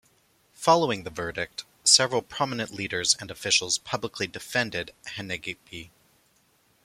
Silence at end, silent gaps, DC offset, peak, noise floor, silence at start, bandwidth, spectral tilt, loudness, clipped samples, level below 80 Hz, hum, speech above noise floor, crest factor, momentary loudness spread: 1 s; none; under 0.1%; -2 dBFS; -65 dBFS; 0.6 s; 16.5 kHz; -1.5 dB/octave; -25 LUFS; under 0.1%; -62 dBFS; none; 38 dB; 26 dB; 17 LU